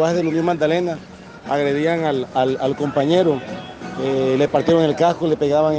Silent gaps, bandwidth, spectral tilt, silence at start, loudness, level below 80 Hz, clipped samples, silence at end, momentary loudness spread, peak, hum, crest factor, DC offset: none; 9 kHz; -6.5 dB/octave; 0 s; -19 LUFS; -54 dBFS; under 0.1%; 0 s; 13 LU; -4 dBFS; none; 14 dB; under 0.1%